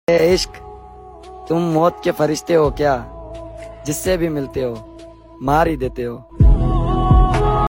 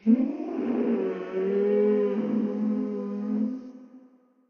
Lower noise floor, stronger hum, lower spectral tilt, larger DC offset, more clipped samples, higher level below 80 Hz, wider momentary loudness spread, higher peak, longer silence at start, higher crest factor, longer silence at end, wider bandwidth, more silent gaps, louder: second, -39 dBFS vs -58 dBFS; neither; second, -6.5 dB/octave vs -10 dB/octave; neither; neither; first, -22 dBFS vs -78 dBFS; first, 20 LU vs 8 LU; first, -2 dBFS vs -10 dBFS; about the same, 0.1 s vs 0.05 s; about the same, 16 dB vs 16 dB; second, 0 s vs 0.5 s; first, 16.5 kHz vs 5.6 kHz; neither; first, -18 LUFS vs -27 LUFS